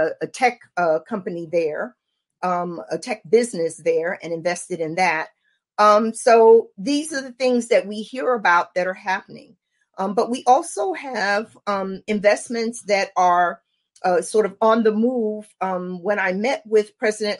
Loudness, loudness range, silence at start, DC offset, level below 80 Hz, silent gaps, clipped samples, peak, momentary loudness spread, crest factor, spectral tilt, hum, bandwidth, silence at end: -20 LUFS; 6 LU; 0 s; under 0.1%; -72 dBFS; none; under 0.1%; -2 dBFS; 10 LU; 18 dB; -4.5 dB/octave; none; 11.5 kHz; 0 s